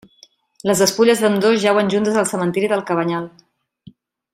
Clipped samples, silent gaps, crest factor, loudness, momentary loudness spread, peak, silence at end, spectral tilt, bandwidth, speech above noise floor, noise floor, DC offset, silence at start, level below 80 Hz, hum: under 0.1%; none; 18 dB; -17 LUFS; 9 LU; -2 dBFS; 1.05 s; -4.5 dB/octave; 16 kHz; 35 dB; -52 dBFS; under 0.1%; 0.65 s; -60 dBFS; none